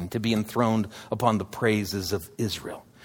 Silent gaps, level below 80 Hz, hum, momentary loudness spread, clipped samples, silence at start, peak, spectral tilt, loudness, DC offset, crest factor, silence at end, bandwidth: none; -56 dBFS; none; 7 LU; under 0.1%; 0 s; -6 dBFS; -5.5 dB/octave; -27 LUFS; under 0.1%; 22 dB; 0.2 s; over 20 kHz